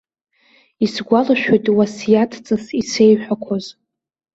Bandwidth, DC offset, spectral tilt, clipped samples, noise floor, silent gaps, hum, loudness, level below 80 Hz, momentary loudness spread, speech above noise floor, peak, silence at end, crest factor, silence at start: 8 kHz; under 0.1%; -5.5 dB/octave; under 0.1%; -56 dBFS; none; none; -17 LUFS; -58 dBFS; 9 LU; 40 dB; -2 dBFS; 0.65 s; 16 dB; 0.8 s